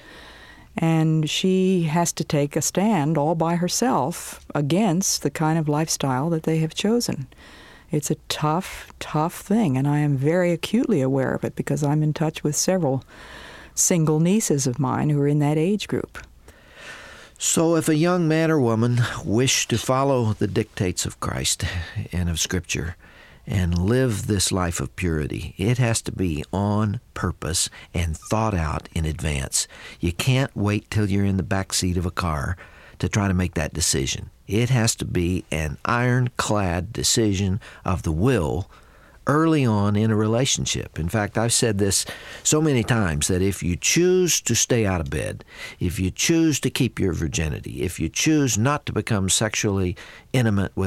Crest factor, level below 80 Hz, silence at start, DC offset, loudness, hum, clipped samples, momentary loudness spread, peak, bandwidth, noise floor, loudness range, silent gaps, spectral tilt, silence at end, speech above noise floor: 16 dB; -40 dBFS; 0.05 s; under 0.1%; -22 LUFS; none; under 0.1%; 9 LU; -6 dBFS; 16 kHz; -48 dBFS; 4 LU; none; -4.5 dB/octave; 0 s; 26 dB